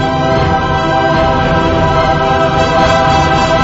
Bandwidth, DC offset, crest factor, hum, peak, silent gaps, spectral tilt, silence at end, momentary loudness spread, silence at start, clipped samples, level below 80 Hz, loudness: 7.8 kHz; under 0.1%; 10 dB; none; 0 dBFS; none; -6 dB/octave; 0 s; 3 LU; 0 s; under 0.1%; -24 dBFS; -11 LUFS